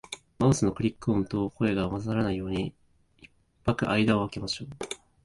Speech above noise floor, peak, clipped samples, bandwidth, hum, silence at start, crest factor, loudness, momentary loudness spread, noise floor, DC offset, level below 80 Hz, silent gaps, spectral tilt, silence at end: 31 dB; -8 dBFS; under 0.1%; 11.5 kHz; none; 0.1 s; 20 dB; -28 LUFS; 12 LU; -58 dBFS; under 0.1%; -50 dBFS; none; -6 dB/octave; 0.3 s